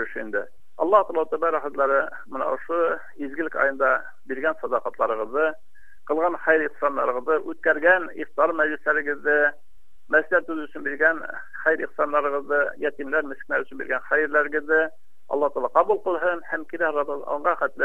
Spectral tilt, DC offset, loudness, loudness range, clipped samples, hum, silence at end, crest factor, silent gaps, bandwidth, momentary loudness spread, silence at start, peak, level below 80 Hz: -6 dB/octave; 2%; -24 LUFS; 3 LU; under 0.1%; none; 0 s; 20 dB; none; 7.2 kHz; 9 LU; 0 s; -4 dBFS; -64 dBFS